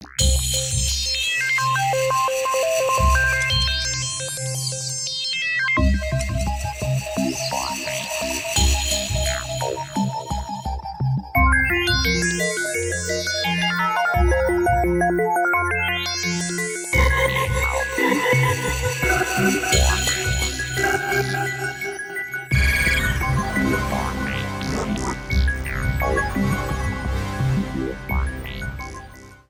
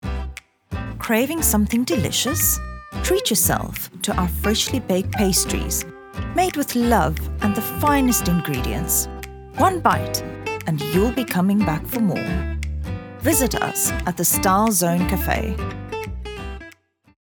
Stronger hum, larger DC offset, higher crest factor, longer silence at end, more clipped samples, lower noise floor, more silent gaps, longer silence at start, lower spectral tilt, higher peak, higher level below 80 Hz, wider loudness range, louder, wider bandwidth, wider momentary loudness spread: neither; neither; about the same, 18 dB vs 20 dB; second, 0.15 s vs 0.6 s; neither; second, -41 dBFS vs -49 dBFS; neither; about the same, 0 s vs 0.05 s; about the same, -3.5 dB/octave vs -4 dB/octave; second, -4 dBFS vs 0 dBFS; about the same, -28 dBFS vs -32 dBFS; about the same, 4 LU vs 2 LU; about the same, -21 LUFS vs -20 LUFS; second, 17 kHz vs over 20 kHz; second, 8 LU vs 13 LU